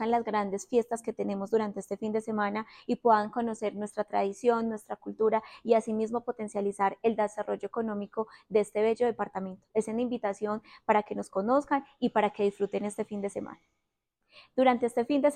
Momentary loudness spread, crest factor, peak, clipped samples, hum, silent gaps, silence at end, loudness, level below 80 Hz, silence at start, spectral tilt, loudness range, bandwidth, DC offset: 9 LU; 18 dB; -10 dBFS; under 0.1%; none; none; 0 s; -30 LUFS; -70 dBFS; 0 s; -6 dB/octave; 2 LU; 11.5 kHz; under 0.1%